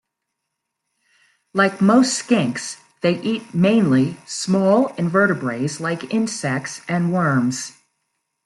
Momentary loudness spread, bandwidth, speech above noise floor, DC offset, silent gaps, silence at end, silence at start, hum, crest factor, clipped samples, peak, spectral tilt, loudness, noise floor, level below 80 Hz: 10 LU; 12 kHz; 60 dB; under 0.1%; none; 0.75 s; 1.55 s; none; 18 dB; under 0.1%; -4 dBFS; -5.5 dB/octave; -19 LUFS; -79 dBFS; -64 dBFS